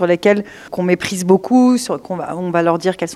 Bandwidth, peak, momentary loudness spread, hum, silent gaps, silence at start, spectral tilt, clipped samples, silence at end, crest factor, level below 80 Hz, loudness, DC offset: 13.5 kHz; 0 dBFS; 10 LU; none; none; 0 s; -5.5 dB/octave; under 0.1%; 0 s; 16 dB; -58 dBFS; -16 LUFS; under 0.1%